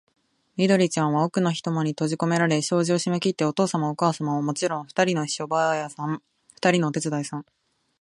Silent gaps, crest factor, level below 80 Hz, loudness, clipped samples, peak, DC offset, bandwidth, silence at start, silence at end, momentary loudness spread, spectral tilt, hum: none; 18 dB; -70 dBFS; -24 LUFS; under 0.1%; -6 dBFS; under 0.1%; 11.5 kHz; 0.55 s; 0.6 s; 8 LU; -5 dB/octave; none